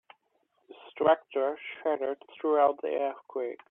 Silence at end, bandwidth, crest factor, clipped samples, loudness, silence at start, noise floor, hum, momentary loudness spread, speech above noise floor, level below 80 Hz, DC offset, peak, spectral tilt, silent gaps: 0.15 s; 3.9 kHz; 20 dB; under 0.1%; -29 LUFS; 0.7 s; -73 dBFS; none; 11 LU; 45 dB; -76 dBFS; under 0.1%; -10 dBFS; -8 dB/octave; none